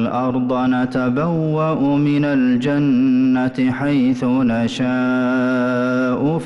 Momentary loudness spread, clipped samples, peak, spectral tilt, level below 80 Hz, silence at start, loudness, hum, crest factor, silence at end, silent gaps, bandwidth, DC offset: 3 LU; under 0.1%; -10 dBFS; -8 dB/octave; -52 dBFS; 0 s; -17 LUFS; none; 8 dB; 0 s; none; 7.6 kHz; under 0.1%